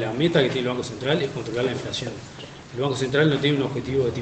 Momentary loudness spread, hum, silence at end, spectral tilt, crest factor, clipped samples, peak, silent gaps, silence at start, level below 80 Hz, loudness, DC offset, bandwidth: 14 LU; none; 0 s; -5.5 dB/octave; 18 dB; under 0.1%; -6 dBFS; none; 0 s; -52 dBFS; -24 LUFS; under 0.1%; 8.8 kHz